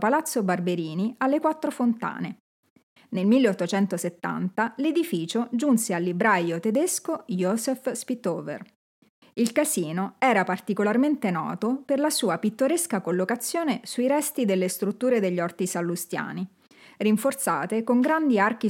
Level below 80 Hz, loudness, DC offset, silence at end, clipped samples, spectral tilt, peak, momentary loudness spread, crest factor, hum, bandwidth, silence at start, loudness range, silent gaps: -84 dBFS; -25 LUFS; under 0.1%; 0 s; under 0.1%; -5 dB/octave; -6 dBFS; 8 LU; 18 dB; none; 17 kHz; 0 s; 2 LU; 2.40-2.63 s, 2.70-2.76 s, 2.83-2.96 s, 8.75-9.02 s, 9.09-9.22 s